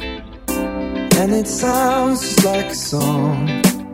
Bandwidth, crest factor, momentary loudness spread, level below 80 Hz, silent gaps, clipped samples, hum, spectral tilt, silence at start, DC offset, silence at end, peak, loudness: 16.5 kHz; 18 dB; 8 LU; -38 dBFS; none; under 0.1%; none; -4.5 dB/octave; 0 s; under 0.1%; 0 s; 0 dBFS; -17 LUFS